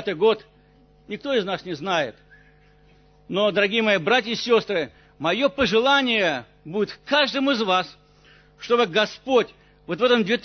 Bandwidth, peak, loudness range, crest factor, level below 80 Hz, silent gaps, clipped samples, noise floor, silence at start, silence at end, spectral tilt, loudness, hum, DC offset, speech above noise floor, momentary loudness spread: 6.6 kHz; -6 dBFS; 5 LU; 16 dB; -58 dBFS; none; under 0.1%; -55 dBFS; 0 s; 0.05 s; -4.5 dB/octave; -22 LUFS; 50 Hz at -55 dBFS; under 0.1%; 33 dB; 13 LU